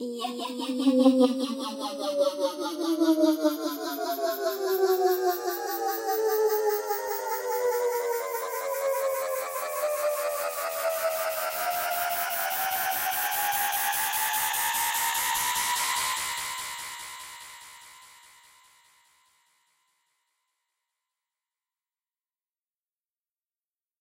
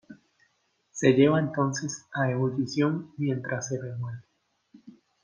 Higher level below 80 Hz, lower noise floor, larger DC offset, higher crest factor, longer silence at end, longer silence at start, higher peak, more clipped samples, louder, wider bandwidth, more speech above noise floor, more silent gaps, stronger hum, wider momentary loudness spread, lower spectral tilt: about the same, -70 dBFS vs -70 dBFS; first, under -90 dBFS vs -72 dBFS; neither; about the same, 22 dB vs 22 dB; first, 5.9 s vs 0.35 s; about the same, 0 s vs 0.1 s; about the same, -8 dBFS vs -6 dBFS; neither; about the same, -27 LUFS vs -27 LUFS; first, 16 kHz vs 10 kHz; first, over 64 dB vs 46 dB; neither; neither; second, 9 LU vs 15 LU; second, -1 dB/octave vs -6 dB/octave